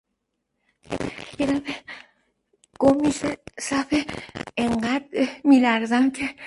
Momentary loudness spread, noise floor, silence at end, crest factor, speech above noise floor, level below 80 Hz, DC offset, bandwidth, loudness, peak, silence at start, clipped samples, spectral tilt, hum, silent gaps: 16 LU; -78 dBFS; 0 s; 18 dB; 56 dB; -52 dBFS; under 0.1%; 11.5 kHz; -23 LUFS; -6 dBFS; 0.9 s; under 0.1%; -4.5 dB/octave; none; none